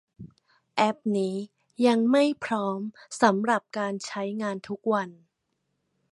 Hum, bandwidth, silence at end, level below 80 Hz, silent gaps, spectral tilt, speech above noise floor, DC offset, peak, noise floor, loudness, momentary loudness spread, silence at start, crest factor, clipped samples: none; 11.5 kHz; 1 s; -72 dBFS; none; -5 dB/octave; 52 dB; under 0.1%; -4 dBFS; -78 dBFS; -26 LUFS; 12 LU; 0.2 s; 22 dB; under 0.1%